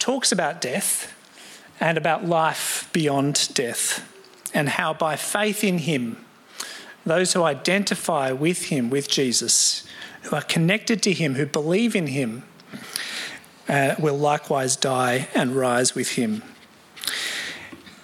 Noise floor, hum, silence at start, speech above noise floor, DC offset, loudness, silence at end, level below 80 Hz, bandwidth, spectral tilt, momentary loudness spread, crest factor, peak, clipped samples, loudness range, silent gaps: -46 dBFS; none; 0 s; 24 dB; under 0.1%; -22 LUFS; 0.05 s; -70 dBFS; 16.5 kHz; -3.5 dB/octave; 14 LU; 22 dB; -2 dBFS; under 0.1%; 3 LU; none